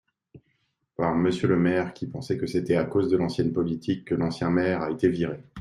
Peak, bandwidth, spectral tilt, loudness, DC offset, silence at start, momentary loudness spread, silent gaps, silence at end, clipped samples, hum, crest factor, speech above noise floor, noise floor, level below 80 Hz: -8 dBFS; 11.5 kHz; -7.5 dB/octave; -26 LUFS; under 0.1%; 0.35 s; 7 LU; none; 0 s; under 0.1%; none; 18 dB; 48 dB; -73 dBFS; -58 dBFS